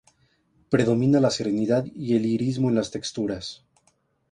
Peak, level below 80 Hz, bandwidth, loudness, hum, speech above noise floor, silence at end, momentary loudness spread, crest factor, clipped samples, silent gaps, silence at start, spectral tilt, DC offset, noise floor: -8 dBFS; -58 dBFS; 10.5 kHz; -24 LUFS; none; 44 dB; 0.8 s; 9 LU; 18 dB; under 0.1%; none; 0.7 s; -6.5 dB/octave; under 0.1%; -67 dBFS